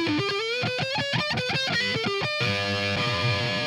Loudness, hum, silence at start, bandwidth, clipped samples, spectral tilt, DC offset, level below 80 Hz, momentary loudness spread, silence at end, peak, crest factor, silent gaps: -25 LUFS; none; 0 s; 15 kHz; under 0.1%; -4.5 dB/octave; under 0.1%; -56 dBFS; 2 LU; 0 s; -14 dBFS; 12 dB; none